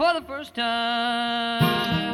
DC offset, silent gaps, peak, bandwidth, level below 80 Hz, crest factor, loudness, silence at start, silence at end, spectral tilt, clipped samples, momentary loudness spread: under 0.1%; none; -8 dBFS; 17.5 kHz; -54 dBFS; 16 dB; -24 LUFS; 0 s; 0 s; -5.5 dB/octave; under 0.1%; 6 LU